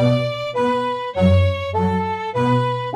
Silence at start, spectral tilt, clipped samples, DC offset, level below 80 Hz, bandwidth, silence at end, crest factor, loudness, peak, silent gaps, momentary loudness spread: 0 s; -7.5 dB/octave; under 0.1%; under 0.1%; -42 dBFS; 10 kHz; 0 s; 14 dB; -19 LUFS; -4 dBFS; none; 6 LU